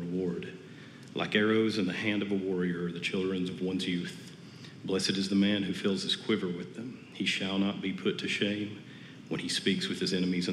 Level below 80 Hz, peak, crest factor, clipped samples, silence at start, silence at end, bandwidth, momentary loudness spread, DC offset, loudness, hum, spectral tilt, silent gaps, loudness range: -74 dBFS; -12 dBFS; 20 dB; under 0.1%; 0 s; 0 s; 12 kHz; 16 LU; under 0.1%; -31 LUFS; none; -5 dB/octave; none; 2 LU